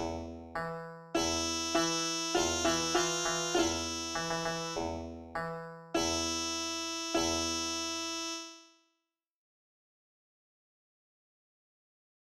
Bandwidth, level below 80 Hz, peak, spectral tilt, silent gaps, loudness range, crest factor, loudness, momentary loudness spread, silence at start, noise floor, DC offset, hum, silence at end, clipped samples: 15 kHz; -56 dBFS; -14 dBFS; -2.5 dB/octave; none; 8 LU; 20 dB; -33 LUFS; 11 LU; 0 s; -85 dBFS; under 0.1%; none; 3.65 s; under 0.1%